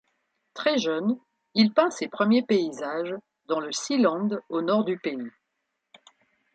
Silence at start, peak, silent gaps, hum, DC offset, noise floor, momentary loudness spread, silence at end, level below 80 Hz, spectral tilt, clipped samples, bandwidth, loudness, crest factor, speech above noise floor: 0.55 s; -6 dBFS; none; none; under 0.1%; -80 dBFS; 13 LU; 1.25 s; -76 dBFS; -4.5 dB/octave; under 0.1%; 9 kHz; -26 LUFS; 20 dB; 55 dB